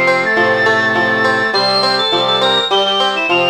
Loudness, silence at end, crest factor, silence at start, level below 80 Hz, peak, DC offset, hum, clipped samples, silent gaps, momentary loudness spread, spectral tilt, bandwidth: -12 LUFS; 0 s; 12 dB; 0 s; -62 dBFS; -2 dBFS; 0.3%; none; under 0.1%; none; 1 LU; -3.5 dB/octave; over 20 kHz